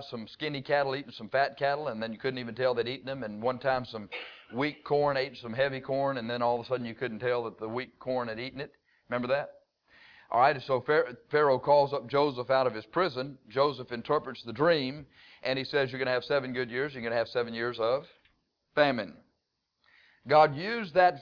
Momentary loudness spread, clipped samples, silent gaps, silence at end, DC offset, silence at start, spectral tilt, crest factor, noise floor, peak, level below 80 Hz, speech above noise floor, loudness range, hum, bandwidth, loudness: 12 LU; under 0.1%; none; 0 s; under 0.1%; 0 s; -7 dB/octave; 20 dB; -80 dBFS; -10 dBFS; -68 dBFS; 51 dB; 5 LU; none; 5.4 kHz; -30 LUFS